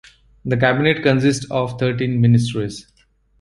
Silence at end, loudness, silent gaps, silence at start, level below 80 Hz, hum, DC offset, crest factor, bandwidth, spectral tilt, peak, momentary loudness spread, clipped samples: 0.6 s; -18 LUFS; none; 0.45 s; -48 dBFS; none; under 0.1%; 18 dB; 11.5 kHz; -6.5 dB/octave; 0 dBFS; 12 LU; under 0.1%